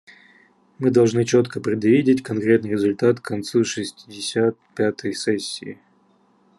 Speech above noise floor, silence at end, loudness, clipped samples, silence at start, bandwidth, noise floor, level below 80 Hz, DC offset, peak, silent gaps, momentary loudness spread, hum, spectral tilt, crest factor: 39 dB; 0.85 s; -21 LUFS; under 0.1%; 0.8 s; 12 kHz; -59 dBFS; -66 dBFS; under 0.1%; -4 dBFS; none; 11 LU; none; -5.5 dB/octave; 18 dB